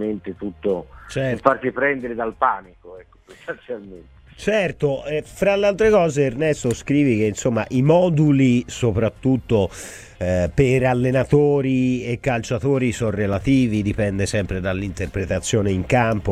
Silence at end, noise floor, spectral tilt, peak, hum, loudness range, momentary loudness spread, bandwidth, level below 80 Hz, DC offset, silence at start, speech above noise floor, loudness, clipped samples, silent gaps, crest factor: 0 s; -43 dBFS; -6.5 dB/octave; 0 dBFS; none; 6 LU; 11 LU; 14 kHz; -40 dBFS; under 0.1%; 0 s; 23 dB; -20 LUFS; under 0.1%; none; 20 dB